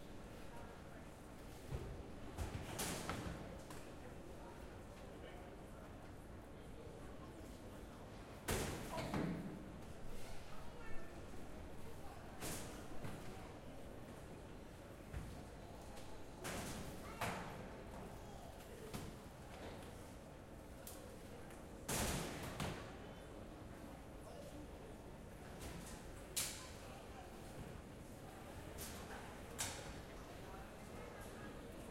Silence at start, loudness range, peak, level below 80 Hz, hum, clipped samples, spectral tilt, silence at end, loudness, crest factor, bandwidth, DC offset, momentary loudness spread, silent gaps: 0 s; 7 LU; -24 dBFS; -58 dBFS; none; under 0.1%; -4 dB/octave; 0 s; -51 LUFS; 24 dB; 16 kHz; under 0.1%; 11 LU; none